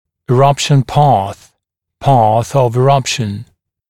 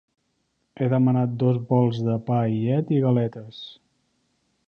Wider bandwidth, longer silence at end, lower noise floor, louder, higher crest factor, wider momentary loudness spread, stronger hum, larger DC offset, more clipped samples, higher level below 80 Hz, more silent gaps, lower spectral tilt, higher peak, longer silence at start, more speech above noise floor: first, 13.5 kHz vs 5.6 kHz; second, 0.45 s vs 0.95 s; about the same, -72 dBFS vs -72 dBFS; first, -12 LUFS vs -23 LUFS; about the same, 14 dB vs 16 dB; second, 9 LU vs 16 LU; neither; neither; neither; first, -46 dBFS vs -62 dBFS; neither; second, -6 dB/octave vs -10 dB/octave; first, 0 dBFS vs -8 dBFS; second, 0.3 s vs 0.8 s; first, 60 dB vs 50 dB